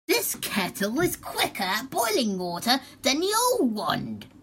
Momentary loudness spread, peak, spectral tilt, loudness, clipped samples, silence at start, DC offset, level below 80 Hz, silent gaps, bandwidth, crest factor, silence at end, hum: 6 LU; -8 dBFS; -3 dB/octave; -25 LUFS; under 0.1%; 0.1 s; under 0.1%; -58 dBFS; none; 16.5 kHz; 20 dB; 0.05 s; none